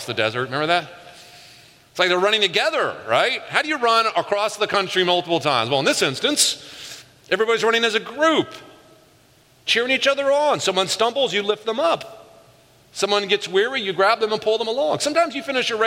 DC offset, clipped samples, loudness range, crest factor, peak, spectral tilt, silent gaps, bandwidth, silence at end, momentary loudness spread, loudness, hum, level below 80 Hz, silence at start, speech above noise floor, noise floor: under 0.1%; under 0.1%; 2 LU; 20 dB; 0 dBFS; -2.5 dB/octave; none; 16 kHz; 0 s; 7 LU; -19 LUFS; none; -68 dBFS; 0 s; 34 dB; -54 dBFS